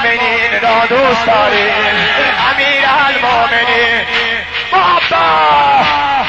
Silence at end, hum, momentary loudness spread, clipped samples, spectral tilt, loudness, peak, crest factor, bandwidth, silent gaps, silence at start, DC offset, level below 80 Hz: 0 s; none; 3 LU; under 0.1%; -3.5 dB/octave; -10 LUFS; -2 dBFS; 10 dB; 8.8 kHz; none; 0 s; under 0.1%; -40 dBFS